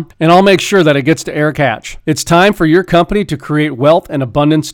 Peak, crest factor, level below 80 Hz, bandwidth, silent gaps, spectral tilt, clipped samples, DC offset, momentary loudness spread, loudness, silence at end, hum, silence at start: 0 dBFS; 10 dB; -36 dBFS; 17.5 kHz; none; -5.5 dB/octave; under 0.1%; under 0.1%; 8 LU; -11 LUFS; 0 s; none; 0 s